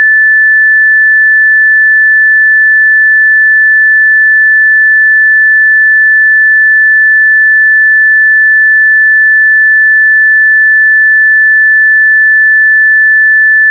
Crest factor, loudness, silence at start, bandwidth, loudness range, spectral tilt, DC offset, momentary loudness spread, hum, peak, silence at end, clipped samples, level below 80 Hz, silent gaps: 4 dB; -3 LUFS; 0 s; 2 kHz; 0 LU; 9 dB/octave; under 0.1%; 0 LU; none; -2 dBFS; 0 s; under 0.1%; under -90 dBFS; none